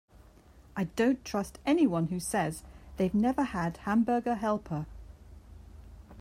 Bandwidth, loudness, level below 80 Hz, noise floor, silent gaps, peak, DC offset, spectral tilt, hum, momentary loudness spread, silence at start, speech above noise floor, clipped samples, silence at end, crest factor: 16 kHz; -30 LUFS; -52 dBFS; -56 dBFS; none; -16 dBFS; under 0.1%; -6 dB/octave; none; 13 LU; 0.75 s; 27 dB; under 0.1%; 0 s; 16 dB